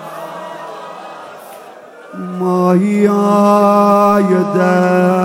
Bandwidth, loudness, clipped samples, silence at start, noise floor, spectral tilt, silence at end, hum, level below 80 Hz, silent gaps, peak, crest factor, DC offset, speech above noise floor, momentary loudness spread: 16.5 kHz; -12 LUFS; under 0.1%; 0 s; -36 dBFS; -7.5 dB/octave; 0 s; none; -62 dBFS; none; 0 dBFS; 12 dB; under 0.1%; 25 dB; 22 LU